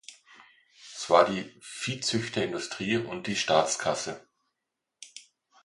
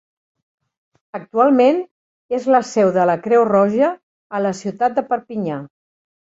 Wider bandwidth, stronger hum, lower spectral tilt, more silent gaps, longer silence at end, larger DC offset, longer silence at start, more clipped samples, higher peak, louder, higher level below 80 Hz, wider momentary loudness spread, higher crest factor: first, 11.5 kHz vs 8 kHz; neither; second, -3.5 dB/octave vs -6.5 dB/octave; second, none vs 1.91-2.29 s, 4.03-4.30 s; second, 0.45 s vs 0.75 s; neither; second, 0.1 s vs 1.15 s; neither; second, -6 dBFS vs -2 dBFS; second, -28 LUFS vs -17 LUFS; about the same, -66 dBFS vs -64 dBFS; first, 23 LU vs 15 LU; first, 26 dB vs 16 dB